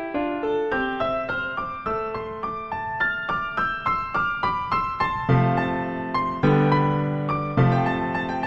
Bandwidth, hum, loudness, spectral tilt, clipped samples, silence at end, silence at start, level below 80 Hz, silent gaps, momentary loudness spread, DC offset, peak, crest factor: 6.8 kHz; none; -24 LUFS; -8.5 dB/octave; under 0.1%; 0 s; 0 s; -46 dBFS; none; 8 LU; under 0.1%; -8 dBFS; 16 dB